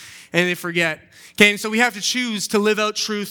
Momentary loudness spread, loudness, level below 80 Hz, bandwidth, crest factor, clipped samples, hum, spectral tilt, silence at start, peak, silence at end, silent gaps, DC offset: 8 LU; -19 LUFS; -64 dBFS; 19.5 kHz; 20 dB; under 0.1%; none; -3 dB/octave; 0 s; 0 dBFS; 0 s; none; under 0.1%